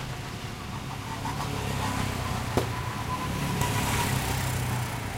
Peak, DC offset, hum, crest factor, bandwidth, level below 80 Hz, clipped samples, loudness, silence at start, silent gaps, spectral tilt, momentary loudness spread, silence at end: -10 dBFS; under 0.1%; none; 20 dB; 16 kHz; -42 dBFS; under 0.1%; -30 LUFS; 0 s; none; -4.5 dB/octave; 9 LU; 0 s